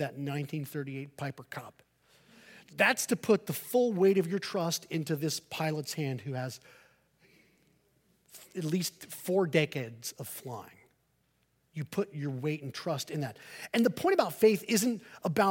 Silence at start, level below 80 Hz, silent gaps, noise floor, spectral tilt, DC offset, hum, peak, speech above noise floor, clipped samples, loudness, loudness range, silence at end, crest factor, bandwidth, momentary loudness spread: 0 s; -76 dBFS; none; -74 dBFS; -5 dB/octave; under 0.1%; none; -10 dBFS; 42 dB; under 0.1%; -31 LUFS; 9 LU; 0 s; 22 dB; 17 kHz; 15 LU